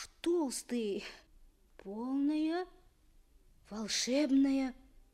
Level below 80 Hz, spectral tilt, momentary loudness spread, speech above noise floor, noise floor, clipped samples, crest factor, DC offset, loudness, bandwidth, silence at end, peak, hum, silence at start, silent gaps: -64 dBFS; -3 dB/octave; 18 LU; 31 dB; -64 dBFS; under 0.1%; 16 dB; under 0.1%; -34 LUFS; 14.5 kHz; 0.35 s; -20 dBFS; none; 0 s; none